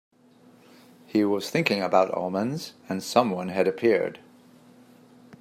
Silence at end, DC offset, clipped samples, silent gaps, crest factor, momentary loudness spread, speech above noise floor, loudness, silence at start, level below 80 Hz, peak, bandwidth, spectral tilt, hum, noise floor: 0.05 s; under 0.1%; under 0.1%; none; 22 dB; 10 LU; 31 dB; -25 LUFS; 1.15 s; -74 dBFS; -4 dBFS; 16 kHz; -5.5 dB/octave; none; -56 dBFS